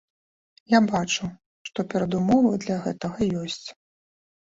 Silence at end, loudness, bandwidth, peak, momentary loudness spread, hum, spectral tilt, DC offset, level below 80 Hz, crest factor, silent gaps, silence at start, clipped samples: 0.8 s; -24 LUFS; 8 kHz; -6 dBFS; 15 LU; none; -5.5 dB/octave; under 0.1%; -56 dBFS; 20 dB; 1.46-1.65 s; 0.7 s; under 0.1%